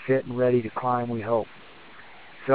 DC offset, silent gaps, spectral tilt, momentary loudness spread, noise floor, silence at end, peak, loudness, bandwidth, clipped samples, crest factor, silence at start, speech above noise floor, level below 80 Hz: 0.4%; none; -11.5 dB/octave; 23 LU; -48 dBFS; 0 s; -6 dBFS; -26 LUFS; 4 kHz; under 0.1%; 20 dB; 0 s; 23 dB; -62 dBFS